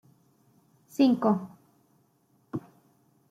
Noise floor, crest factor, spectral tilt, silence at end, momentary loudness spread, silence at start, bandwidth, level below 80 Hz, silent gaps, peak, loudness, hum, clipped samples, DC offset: -67 dBFS; 20 dB; -7.5 dB/octave; 0.7 s; 17 LU; 1 s; 14.5 kHz; -76 dBFS; none; -10 dBFS; -28 LUFS; none; under 0.1%; under 0.1%